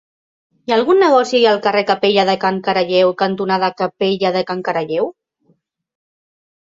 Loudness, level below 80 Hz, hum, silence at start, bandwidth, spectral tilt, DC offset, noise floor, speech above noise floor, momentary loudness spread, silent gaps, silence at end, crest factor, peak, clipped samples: -15 LUFS; -62 dBFS; none; 0.7 s; 7.8 kHz; -5.5 dB/octave; under 0.1%; -60 dBFS; 45 dB; 8 LU; none; 1.55 s; 16 dB; -2 dBFS; under 0.1%